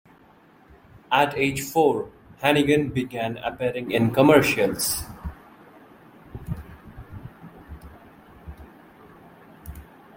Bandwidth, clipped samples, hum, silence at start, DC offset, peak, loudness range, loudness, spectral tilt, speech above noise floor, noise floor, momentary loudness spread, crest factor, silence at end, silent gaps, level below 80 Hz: 16.5 kHz; under 0.1%; none; 1.1 s; under 0.1%; -2 dBFS; 20 LU; -22 LUFS; -4.5 dB/octave; 33 dB; -54 dBFS; 26 LU; 24 dB; 0.35 s; none; -48 dBFS